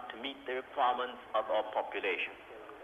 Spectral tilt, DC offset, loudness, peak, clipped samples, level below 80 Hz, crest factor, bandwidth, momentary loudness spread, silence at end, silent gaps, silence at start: -4 dB/octave; under 0.1%; -35 LUFS; -18 dBFS; under 0.1%; -74 dBFS; 18 dB; 13 kHz; 9 LU; 0 s; none; 0 s